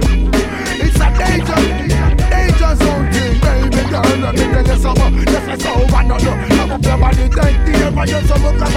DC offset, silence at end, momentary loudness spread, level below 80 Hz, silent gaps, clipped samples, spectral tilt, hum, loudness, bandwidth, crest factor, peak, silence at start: under 0.1%; 0 s; 2 LU; -14 dBFS; none; under 0.1%; -6 dB/octave; none; -14 LUFS; 14.5 kHz; 12 dB; 0 dBFS; 0 s